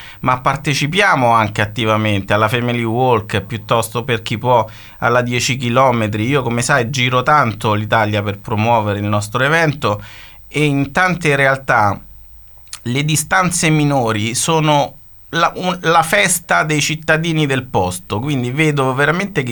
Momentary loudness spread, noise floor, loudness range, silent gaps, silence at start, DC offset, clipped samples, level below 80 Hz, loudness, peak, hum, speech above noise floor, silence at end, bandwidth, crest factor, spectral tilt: 7 LU; -39 dBFS; 2 LU; none; 0 s; under 0.1%; under 0.1%; -44 dBFS; -15 LUFS; 0 dBFS; none; 24 dB; 0 s; 19.5 kHz; 16 dB; -4.5 dB/octave